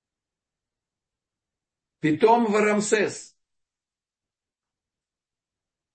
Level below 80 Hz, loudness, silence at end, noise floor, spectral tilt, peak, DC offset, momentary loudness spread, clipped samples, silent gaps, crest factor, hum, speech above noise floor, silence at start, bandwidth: -74 dBFS; -22 LUFS; 2.7 s; under -90 dBFS; -4.5 dB/octave; -6 dBFS; under 0.1%; 10 LU; under 0.1%; none; 22 dB; none; over 69 dB; 2.05 s; 8.8 kHz